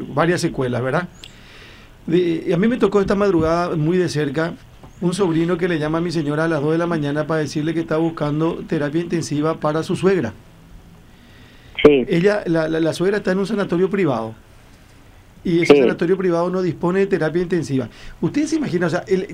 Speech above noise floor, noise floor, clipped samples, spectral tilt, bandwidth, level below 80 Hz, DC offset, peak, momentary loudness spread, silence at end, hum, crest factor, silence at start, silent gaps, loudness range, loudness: 27 dB; -46 dBFS; under 0.1%; -6.5 dB/octave; 13 kHz; -46 dBFS; under 0.1%; 0 dBFS; 8 LU; 0 s; none; 18 dB; 0 s; none; 3 LU; -19 LUFS